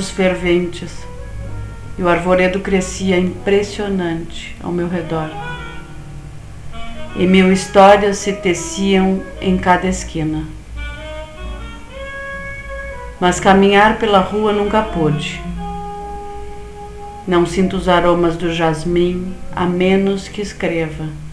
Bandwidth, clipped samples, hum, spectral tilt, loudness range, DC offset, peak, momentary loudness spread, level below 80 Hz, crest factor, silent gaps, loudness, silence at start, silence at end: 11 kHz; under 0.1%; none; -5.5 dB/octave; 8 LU; 0.4%; 0 dBFS; 20 LU; -32 dBFS; 16 dB; none; -16 LUFS; 0 s; 0 s